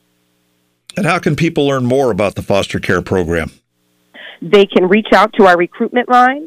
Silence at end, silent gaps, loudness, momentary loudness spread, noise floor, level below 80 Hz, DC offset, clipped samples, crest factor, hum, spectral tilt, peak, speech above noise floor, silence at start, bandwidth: 0 s; none; -13 LUFS; 9 LU; -61 dBFS; -42 dBFS; under 0.1%; under 0.1%; 12 dB; 60 Hz at -40 dBFS; -6 dB/octave; 0 dBFS; 49 dB; 0.95 s; 15 kHz